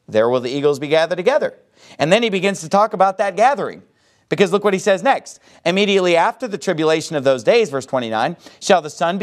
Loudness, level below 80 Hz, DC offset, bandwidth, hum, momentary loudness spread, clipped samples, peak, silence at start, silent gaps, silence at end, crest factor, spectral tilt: -17 LUFS; -68 dBFS; under 0.1%; 13.5 kHz; none; 8 LU; under 0.1%; 0 dBFS; 0.1 s; none; 0 s; 18 dB; -4.5 dB/octave